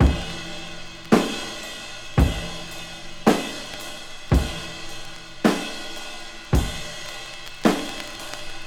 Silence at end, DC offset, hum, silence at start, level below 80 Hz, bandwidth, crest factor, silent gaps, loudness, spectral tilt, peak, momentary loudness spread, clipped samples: 0 s; under 0.1%; none; 0 s; -30 dBFS; 17.5 kHz; 24 dB; none; -26 LUFS; -5 dB/octave; -2 dBFS; 14 LU; under 0.1%